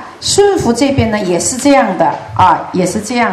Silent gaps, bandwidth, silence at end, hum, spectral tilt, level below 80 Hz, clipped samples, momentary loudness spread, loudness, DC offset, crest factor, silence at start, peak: none; 14.5 kHz; 0 s; none; -4 dB/octave; -40 dBFS; 0.3%; 5 LU; -12 LUFS; under 0.1%; 12 dB; 0 s; 0 dBFS